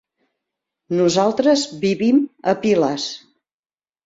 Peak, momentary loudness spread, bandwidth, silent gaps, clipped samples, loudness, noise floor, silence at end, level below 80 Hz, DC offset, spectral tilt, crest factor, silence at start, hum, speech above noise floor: -4 dBFS; 9 LU; 7.8 kHz; none; under 0.1%; -18 LUFS; under -90 dBFS; 0.9 s; -62 dBFS; under 0.1%; -5 dB/octave; 16 dB; 0.9 s; none; over 72 dB